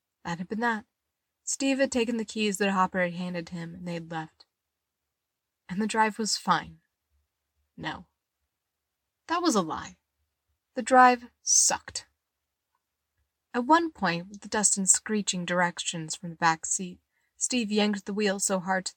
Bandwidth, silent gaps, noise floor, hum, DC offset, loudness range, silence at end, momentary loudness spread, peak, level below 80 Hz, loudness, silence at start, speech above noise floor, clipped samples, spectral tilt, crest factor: 17 kHz; none; -85 dBFS; none; under 0.1%; 9 LU; 0.05 s; 17 LU; -6 dBFS; -66 dBFS; -26 LUFS; 0.25 s; 58 dB; under 0.1%; -2.5 dB/octave; 22 dB